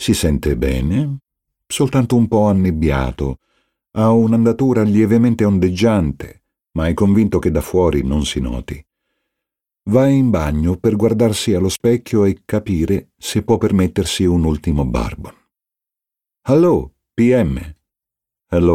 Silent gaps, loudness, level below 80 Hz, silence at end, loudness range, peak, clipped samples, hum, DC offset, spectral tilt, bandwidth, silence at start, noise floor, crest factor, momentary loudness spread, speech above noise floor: none; -16 LUFS; -30 dBFS; 0 s; 3 LU; -2 dBFS; under 0.1%; none; under 0.1%; -6.5 dB/octave; 16 kHz; 0 s; -87 dBFS; 14 dB; 12 LU; 71 dB